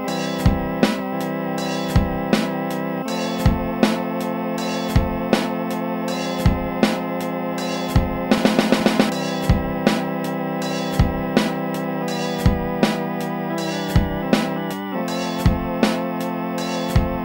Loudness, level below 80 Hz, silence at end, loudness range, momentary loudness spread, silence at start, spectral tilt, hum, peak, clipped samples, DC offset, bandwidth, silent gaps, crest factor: -21 LUFS; -30 dBFS; 0 s; 2 LU; 5 LU; 0 s; -6 dB/octave; none; 0 dBFS; under 0.1%; under 0.1%; 16.5 kHz; none; 20 dB